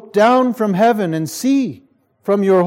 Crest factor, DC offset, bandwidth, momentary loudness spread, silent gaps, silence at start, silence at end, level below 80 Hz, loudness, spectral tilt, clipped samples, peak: 14 dB; under 0.1%; 16.5 kHz; 8 LU; none; 0.15 s; 0 s; -70 dBFS; -16 LUFS; -6 dB/octave; under 0.1%; -2 dBFS